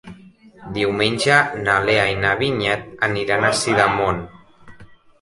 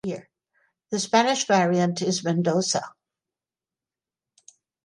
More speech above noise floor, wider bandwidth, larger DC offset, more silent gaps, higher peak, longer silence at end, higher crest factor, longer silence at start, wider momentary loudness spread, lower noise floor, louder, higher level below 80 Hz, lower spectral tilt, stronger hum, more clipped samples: second, 27 dB vs over 68 dB; about the same, 11.5 kHz vs 11.5 kHz; neither; neither; first, -2 dBFS vs -6 dBFS; second, 0.35 s vs 1.95 s; about the same, 18 dB vs 20 dB; about the same, 0.05 s vs 0.05 s; second, 7 LU vs 12 LU; second, -46 dBFS vs under -90 dBFS; first, -18 LUFS vs -23 LUFS; first, -46 dBFS vs -72 dBFS; about the same, -4 dB/octave vs -4 dB/octave; neither; neither